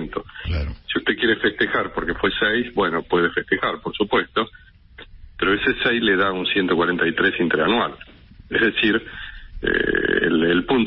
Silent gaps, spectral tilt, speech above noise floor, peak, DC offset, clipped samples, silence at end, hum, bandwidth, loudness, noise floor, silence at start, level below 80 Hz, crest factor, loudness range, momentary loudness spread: none; -10 dB/octave; 28 dB; -6 dBFS; under 0.1%; under 0.1%; 0 s; none; 5.8 kHz; -20 LUFS; -48 dBFS; 0 s; -40 dBFS; 14 dB; 2 LU; 9 LU